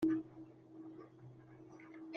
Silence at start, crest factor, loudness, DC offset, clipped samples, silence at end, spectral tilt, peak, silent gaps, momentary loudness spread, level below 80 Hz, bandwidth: 0 s; 18 dB; -47 LUFS; under 0.1%; under 0.1%; 0 s; -8 dB/octave; -26 dBFS; none; 17 LU; -78 dBFS; 6.2 kHz